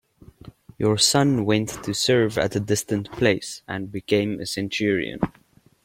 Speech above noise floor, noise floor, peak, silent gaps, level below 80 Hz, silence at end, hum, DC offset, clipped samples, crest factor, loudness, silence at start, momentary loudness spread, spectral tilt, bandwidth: 24 dB; -46 dBFS; -4 dBFS; none; -52 dBFS; 0.55 s; none; under 0.1%; under 0.1%; 18 dB; -22 LUFS; 0.45 s; 12 LU; -4 dB/octave; 16.5 kHz